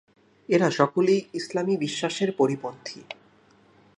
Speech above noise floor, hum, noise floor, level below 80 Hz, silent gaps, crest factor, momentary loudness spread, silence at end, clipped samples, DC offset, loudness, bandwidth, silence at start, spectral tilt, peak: 34 dB; none; -58 dBFS; -74 dBFS; none; 22 dB; 18 LU; 0.85 s; under 0.1%; under 0.1%; -25 LUFS; 11 kHz; 0.5 s; -5.5 dB/octave; -4 dBFS